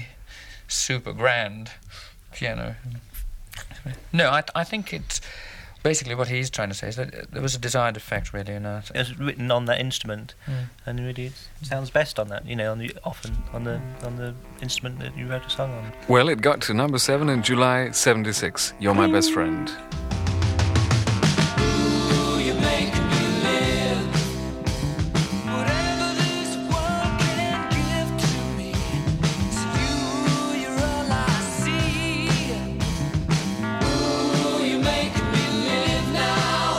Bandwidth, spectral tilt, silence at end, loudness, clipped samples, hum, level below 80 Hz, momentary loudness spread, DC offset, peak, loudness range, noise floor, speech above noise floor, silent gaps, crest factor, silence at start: 16.5 kHz; -4.5 dB/octave; 0 s; -24 LUFS; under 0.1%; none; -38 dBFS; 13 LU; under 0.1%; -2 dBFS; 8 LU; -43 dBFS; 19 dB; none; 22 dB; 0 s